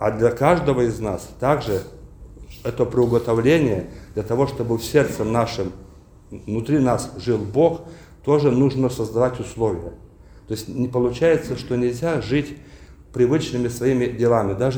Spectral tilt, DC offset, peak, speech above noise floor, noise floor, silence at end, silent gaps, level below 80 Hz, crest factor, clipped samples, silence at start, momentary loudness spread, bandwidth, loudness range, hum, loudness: -7 dB/octave; under 0.1%; -2 dBFS; 20 dB; -40 dBFS; 0 s; none; -44 dBFS; 18 dB; under 0.1%; 0 s; 13 LU; over 20 kHz; 2 LU; none; -21 LUFS